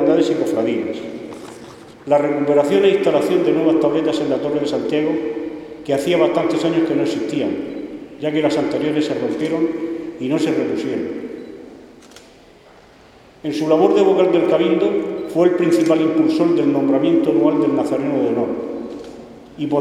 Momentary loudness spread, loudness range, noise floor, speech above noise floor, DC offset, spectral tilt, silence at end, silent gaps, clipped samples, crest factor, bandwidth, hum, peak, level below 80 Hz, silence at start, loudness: 16 LU; 7 LU; -46 dBFS; 29 dB; under 0.1%; -6.5 dB/octave; 0 s; none; under 0.1%; 18 dB; 12.5 kHz; none; 0 dBFS; -58 dBFS; 0 s; -18 LUFS